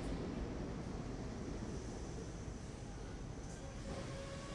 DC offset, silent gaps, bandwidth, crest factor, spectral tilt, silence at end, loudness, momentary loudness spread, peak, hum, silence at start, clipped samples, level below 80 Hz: under 0.1%; none; 11.5 kHz; 14 dB; -6 dB/octave; 0 s; -47 LUFS; 5 LU; -30 dBFS; none; 0 s; under 0.1%; -50 dBFS